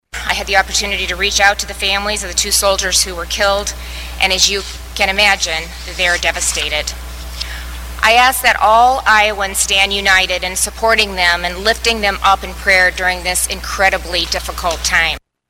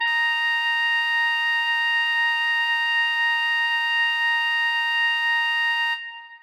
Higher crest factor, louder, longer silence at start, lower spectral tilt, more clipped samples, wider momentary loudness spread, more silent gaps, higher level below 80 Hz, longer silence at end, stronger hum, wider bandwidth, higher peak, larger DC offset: first, 14 dB vs 8 dB; first, -13 LUFS vs -20 LUFS; first, 0.15 s vs 0 s; first, -1 dB/octave vs 6 dB/octave; neither; first, 10 LU vs 1 LU; neither; first, -30 dBFS vs under -90 dBFS; first, 0.3 s vs 0.05 s; first, 60 Hz at -30 dBFS vs none; about the same, 17 kHz vs 18.5 kHz; first, 0 dBFS vs -14 dBFS; neither